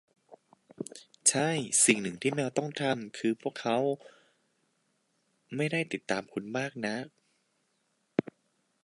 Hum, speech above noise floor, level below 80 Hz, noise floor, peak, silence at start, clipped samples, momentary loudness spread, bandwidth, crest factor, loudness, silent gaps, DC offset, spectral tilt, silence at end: none; 45 dB; -76 dBFS; -76 dBFS; -8 dBFS; 0.3 s; under 0.1%; 16 LU; 11.5 kHz; 24 dB; -30 LUFS; none; under 0.1%; -3 dB/octave; 0.65 s